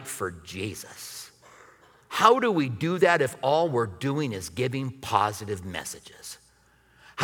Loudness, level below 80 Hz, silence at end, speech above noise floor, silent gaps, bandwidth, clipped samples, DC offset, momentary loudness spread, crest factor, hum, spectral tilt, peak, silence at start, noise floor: -26 LUFS; -62 dBFS; 0 s; 35 dB; none; 19.5 kHz; under 0.1%; under 0.1%; 20 LU; 24 dB; none; -5 dB/octave; -4 dBFS; 0 s; -61 dBFS